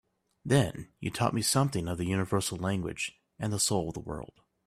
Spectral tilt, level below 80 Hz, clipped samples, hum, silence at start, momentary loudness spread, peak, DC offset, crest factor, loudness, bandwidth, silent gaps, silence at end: -4.5 dB/octave; -56 dBFS; under 0.1%; none; 0.45 s; 13 LU; -12 dBFS; under 0.1%; 20 dB; -30 LUFS; 15 kHz; none; 0.4 s